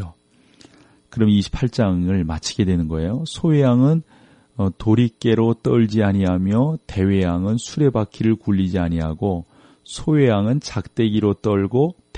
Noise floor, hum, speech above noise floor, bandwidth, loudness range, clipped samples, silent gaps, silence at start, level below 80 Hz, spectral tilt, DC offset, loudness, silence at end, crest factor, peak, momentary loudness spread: -54 dBFS; none; 36 dB; 10 kHz; 2 LU; under 0.1%; none; 0 s; -40 dBFS; -7.5 dB/octave; under 0.1%; -19 LUFS; 0 s; 16 dB; -4 dBFS; 7 LU